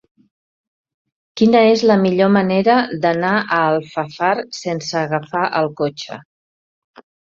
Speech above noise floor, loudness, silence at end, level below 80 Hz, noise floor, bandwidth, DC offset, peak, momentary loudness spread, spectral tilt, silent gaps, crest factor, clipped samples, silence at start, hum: over 74 dB; -16 LUFS; 1.1 s; -60 dBFS; under -90 dBFS; 7.6 kHz; under 0.1%; -2 dBFS; 12 LU; -6 dB/octave; none; 16 dB; under 0.1%; 1.35 s; none